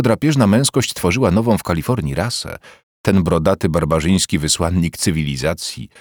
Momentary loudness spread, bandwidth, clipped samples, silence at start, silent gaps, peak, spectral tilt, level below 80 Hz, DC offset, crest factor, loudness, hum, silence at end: 8 LU; over 20 kHz; under 0.1%; 0 s; 2.83-3.04 s; -2 dBFS; -5 dB/octave; -36 dBFS; under 0.1%; 14 dB; -17 LUFS; none; 0.15 s